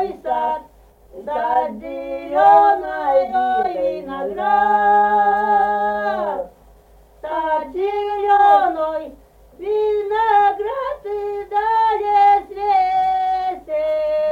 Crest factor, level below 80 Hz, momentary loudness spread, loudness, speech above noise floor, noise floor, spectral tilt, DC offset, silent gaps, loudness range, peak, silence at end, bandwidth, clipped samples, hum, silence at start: 16 dB; -50 dBFS; 13 LU; -18 LUFS; 31 dB; -48 dBFS; -5.5 dB/octave; under 0.1%; none; 3 LU; -2 dBFS; 0 s; 5.2 kHz; under 0.1%; none; 0 s